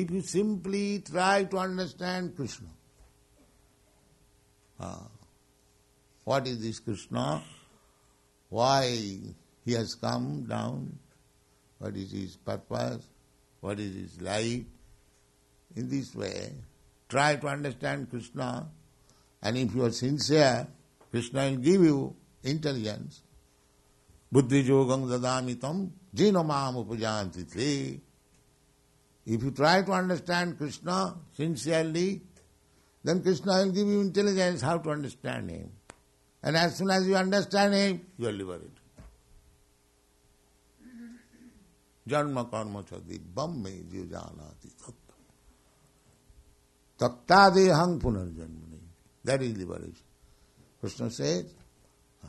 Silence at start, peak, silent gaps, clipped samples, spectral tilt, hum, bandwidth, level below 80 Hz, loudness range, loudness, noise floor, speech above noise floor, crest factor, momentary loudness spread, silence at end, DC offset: 0 s; -6 dBFS; none; under 0.1%; -5.5 dB/octave; none; 12 kHz; -58 dBFS; 12 LU; -29 LUFS; -66 dBFS; 37 dB; 24 dB; 19 LU; 0 s; under 0.1%